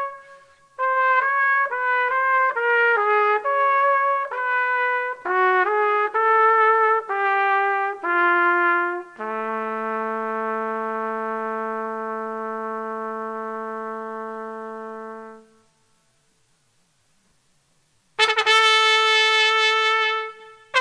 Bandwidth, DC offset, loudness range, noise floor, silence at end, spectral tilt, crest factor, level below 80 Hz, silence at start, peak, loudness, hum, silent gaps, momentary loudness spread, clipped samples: 11 kHz; under 0.1%; 14 LU; -64 dBFS; 0 s; -1.5 dB/octave; 20 dB; -76 dBFS; 0 s; 0 dBFS; -20 LUFS; none; none; 15 LU; under 0.1%